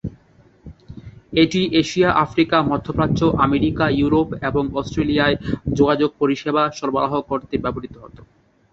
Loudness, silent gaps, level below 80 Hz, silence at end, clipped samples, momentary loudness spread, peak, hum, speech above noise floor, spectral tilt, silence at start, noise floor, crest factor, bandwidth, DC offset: -19 LUFS; none; -40 dBFS; 0.5 s; under 0.1%; 9 LU; -2 dBFS; none; 34 dB; -6.5 dB/octave; 0.05 s; -52 dBFS; 18 dB; 7.8 kHz; under 0.1%